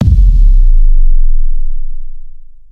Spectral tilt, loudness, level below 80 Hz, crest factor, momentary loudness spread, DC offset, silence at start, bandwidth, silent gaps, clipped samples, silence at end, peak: -9.5 dB/octave; -14 LUFS; -6 dBFS; 6 dB; 19 LU; under 0.1%; 0 s; 0.6 kHz; none; 0.7%; 0.2 s; 0 dBFS